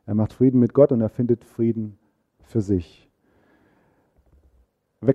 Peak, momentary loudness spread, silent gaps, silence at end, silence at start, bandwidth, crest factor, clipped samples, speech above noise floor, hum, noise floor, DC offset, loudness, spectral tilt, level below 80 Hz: -2 dBFS; 11 LU; none; 0 s; 0.05 s; 7.8 kHz; 22 dB; under 0.1%; 43 dB; none; -63 dBFS; under 0.1%; -21 LUFS; -10.5 dB/octave; -52 dBFS